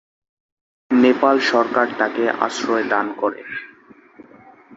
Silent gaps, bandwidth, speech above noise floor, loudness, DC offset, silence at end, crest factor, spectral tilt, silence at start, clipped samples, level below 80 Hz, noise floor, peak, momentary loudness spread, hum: none; 8 kHz; 29 dB; -18 LUFS; under 0.1%; 0 s; 20 dB; -4 dB/octave; 0.9 s; under 0.1%; -66 dBFS; -48 dBFS; -2 dBFS; 10 LU; none